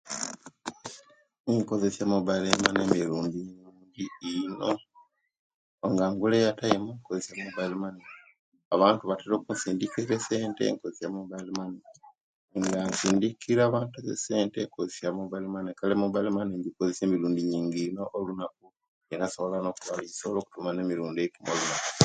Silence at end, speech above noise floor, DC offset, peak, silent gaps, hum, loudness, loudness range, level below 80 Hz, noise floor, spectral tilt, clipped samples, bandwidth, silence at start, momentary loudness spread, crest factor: 0 s; 33 dB; under 0.1%; 0 dBFS; 1.40-1.44 s, 5.39-5.78 s, 8.39-8.52 s, 8.65-8.71 s, 12.21-12.48 s, 18.88-19.01 s; none; -29 LUFS; 4 LU; -64 dBFS; -62 dBFS; -4.5 dB/octave; under 0.1%; 9.6 kHz; 0.05 s; 14 LU; 30 dB